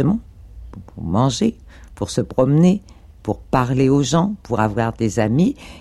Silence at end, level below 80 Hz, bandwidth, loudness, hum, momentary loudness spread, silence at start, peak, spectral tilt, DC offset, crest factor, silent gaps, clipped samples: 0 s; -40 dBFS; 12.5 kHz; -19 LUFS; none; 14 LU; 0 s; -4 dBFS; -6.5 dB/octave; under 0.1%; 16 dB; none; under 0.1%